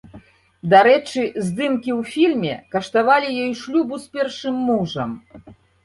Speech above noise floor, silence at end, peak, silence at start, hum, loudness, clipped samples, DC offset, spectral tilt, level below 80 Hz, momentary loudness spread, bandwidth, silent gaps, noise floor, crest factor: 27 dB; 0.3 s; -2 dBFS; 0.15 s; none; -19 LUFS; under 0.1%; under 0.1%; -5.5 dB/octave; -58 dBFS; 12 LU; 11.5 kHz; none; -46 dBFS; 18 dB